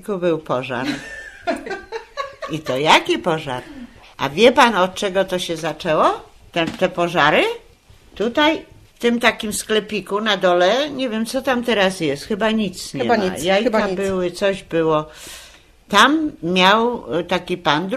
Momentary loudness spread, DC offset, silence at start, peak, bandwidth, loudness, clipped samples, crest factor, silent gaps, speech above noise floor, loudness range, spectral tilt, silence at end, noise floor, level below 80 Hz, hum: 15 LU; under 0.1%; 0.05 s; 0 dBFS; 14 kHz; -18 LUFS; under 0.1%; 20 dB; none; 30 dB; 3 LU; -4 dB/octave; 0 s; -48 dBFS; -50 dBFS; none